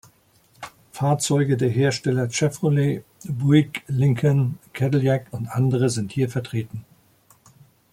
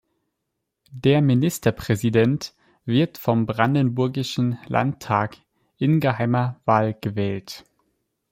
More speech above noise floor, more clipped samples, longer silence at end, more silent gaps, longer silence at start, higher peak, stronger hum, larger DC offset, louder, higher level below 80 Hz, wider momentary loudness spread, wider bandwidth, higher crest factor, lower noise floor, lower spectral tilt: second, 38 dB vs 58 dB; neither; first, 1.1 s vs 0.7 s; neither; second, 0.6 s vs 0.9 s; about the same, -4 dBFS vs -2 dBFS; neither; neither; about the same, -22 LUFS vs -22 LUFS; about the same, -58 dBFS vs -56 dBFS; first, 13 LU vs 9 LU; about the same, 15 kHz vs 16.5 kHz; about the same, 18 dB vs 20 dB; second, -58 dBFS vs -79 dBFS; about the same, -6.5 dB/octave vs -7 dB/octave